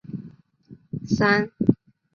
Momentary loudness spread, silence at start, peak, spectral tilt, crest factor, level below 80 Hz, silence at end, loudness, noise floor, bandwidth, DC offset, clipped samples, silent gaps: 18 LU; 0.1 s; -2 dBFS; -6.5 dB/octave; 22 dB; -54 dBFS; 0.4 s; -22 LUFS; -50 dBFS; 7 kHz; under 0.1%; under 0.1%; none